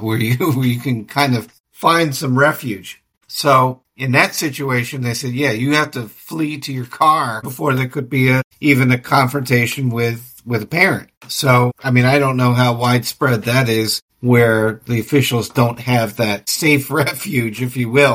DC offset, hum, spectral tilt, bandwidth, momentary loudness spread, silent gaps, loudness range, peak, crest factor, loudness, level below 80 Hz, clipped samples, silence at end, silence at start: under 0.1%; none; -5.5 dB/octave; 17 kHz; 9 LU; 1.60-1.64 s, 3.17-3.21 s, 8.44-8.51 s, 11.17-11.21 s, 14.02-14.08 s; 3 LU; 0 dBFS; 16 dB; -16 LUFS; -54 dBFS; under 0.1%; 0 s; 0 s